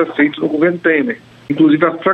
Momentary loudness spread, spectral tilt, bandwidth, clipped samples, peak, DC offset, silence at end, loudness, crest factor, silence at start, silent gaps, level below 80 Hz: 11 LU; -8.5 dB/octave; 4.4 kHz; under 0.1%; 0 dBFS; under 0.1%; 0 s; -14 LUFS; 14 dB; 0 s; none; -60 dBFS